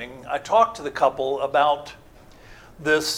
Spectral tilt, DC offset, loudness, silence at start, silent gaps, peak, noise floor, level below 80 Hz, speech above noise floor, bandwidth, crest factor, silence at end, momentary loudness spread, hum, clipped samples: -3 dB/octave; under 0.1%; -22 LUFS; 0 s; none; -4 dBFS; -47 dBFS; -54 dBFS; 25 dB; 17.5 kHz; 18 dB; 0 s; 10 LU; none; under 0.1%